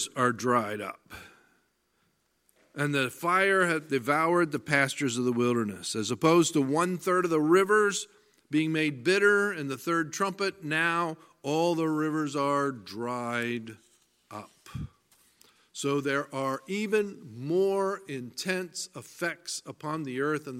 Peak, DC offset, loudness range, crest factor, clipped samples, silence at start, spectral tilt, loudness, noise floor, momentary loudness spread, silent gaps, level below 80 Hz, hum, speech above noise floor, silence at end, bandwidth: -8 dBFS; under 0.1%; 8 LU; 22 dB; under 0.1%; 0 s; -4.5 dB/octave; -28 LUFS; -73 dBFS; 16 LU; none; -66 dBFS; none; 45 dB; 0 s; 16 kHz